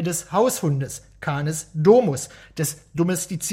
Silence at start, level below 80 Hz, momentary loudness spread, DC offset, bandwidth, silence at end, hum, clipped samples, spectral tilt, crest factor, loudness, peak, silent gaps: 0 s; -54 dBFS; 14 LU; under 0.1%; 16.5 kHz; 0 s; none; under 0.1%; -5.5 dB/octave; 18 dB; -22 LUFS; -4 dBFS; none